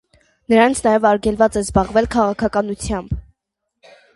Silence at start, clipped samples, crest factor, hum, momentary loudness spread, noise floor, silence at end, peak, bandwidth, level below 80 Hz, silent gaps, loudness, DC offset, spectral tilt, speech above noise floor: 0.5 s; under 0.1%; 18 dB; none; 10 LU; -77 dBFS; 0.95 s; 0 dBFS; 11.5 kHz; -36 dBFS; none; -17 LUFS; under 0.1%; -5.5 dB/octave; 61 dB